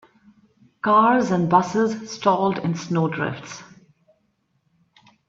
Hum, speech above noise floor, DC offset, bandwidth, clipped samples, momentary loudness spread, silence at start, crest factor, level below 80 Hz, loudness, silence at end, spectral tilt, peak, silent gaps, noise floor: none; 49 dB; under 0.1%; 7.8 kHz; under 0.1%; 12 LU; 0.85 s; 20 dB; -64 dBFS; -20 LUFS; 1.65 s; -6.5 dB/octave; -2 dBFS; none; -69 dBFS